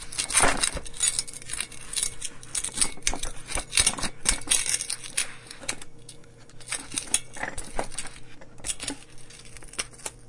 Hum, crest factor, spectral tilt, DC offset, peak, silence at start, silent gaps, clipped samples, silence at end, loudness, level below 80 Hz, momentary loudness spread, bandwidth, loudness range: none; 26 dB; -0.5 dB/octave; under 0.1%; -2 dBFS; 0 s; none; under 0.1%; 0 s; -27 LUFS; -42 dBFS; 20 LU; 11.5 kHz; 7 LU